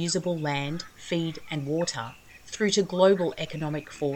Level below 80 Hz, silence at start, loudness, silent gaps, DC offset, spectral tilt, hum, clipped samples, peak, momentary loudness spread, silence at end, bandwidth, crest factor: -60 dBFS; 0 s; -27 LUFS; none; under 0.1%; -4.5 dB/octave; none; under 0.1%; -8 dBFS; 13 LU; 0 s; 16 kHz; 20 dB